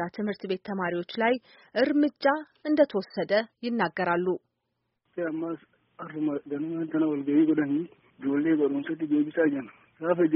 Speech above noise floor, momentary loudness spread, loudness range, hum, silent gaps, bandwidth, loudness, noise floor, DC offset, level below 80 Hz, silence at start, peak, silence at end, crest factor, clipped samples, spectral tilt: 53 dB; 11 LU; 5 LU; none; none; 5.8 kHz; -28 LUFS; -80 dBFS; under 0.1%; -74 dBFS; 0 s; -10 dBFS; 0 s; 18 dB; under 0.1%; -5 dB/octave